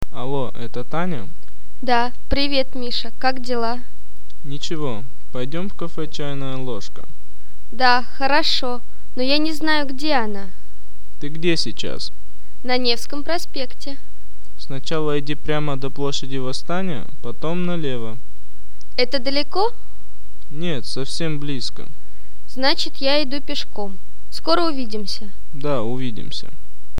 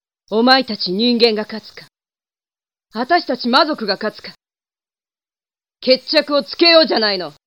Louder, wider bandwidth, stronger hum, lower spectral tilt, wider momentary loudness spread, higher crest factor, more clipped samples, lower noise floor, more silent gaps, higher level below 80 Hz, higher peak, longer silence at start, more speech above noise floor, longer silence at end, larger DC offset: second, -24 LUFS vs -15 LUFS; first, over 20 kHz vs 13.5 kHz; neither; about the same, -5 dB/octave vs -5 dB/octave; about the same, 15 LU vs 15 LU; about the same, 22 dB vs 18 dB; neither; second, -46 dBFS vs under -90 dBFS; neither; first, -42 dBFS vs -70 dBFS; about the same, 0 dBFS vs 0 dBFS; second, 0.1 s vs 0.3 s; second, 23 dB vs over 74 dB; second, 0 s vs 0.15 s; first, 30% vs under 0.1%